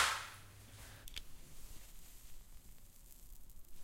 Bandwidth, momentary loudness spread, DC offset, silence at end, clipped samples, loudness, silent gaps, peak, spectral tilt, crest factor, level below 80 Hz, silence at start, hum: 16.5 kHz; 13 LU; under 0.1%; 0 s; under 0.1%; -47 LUFS; none; -20 dBFS; -0.5 dB/octave; 26 dB; -56 dBFS; 0 s; none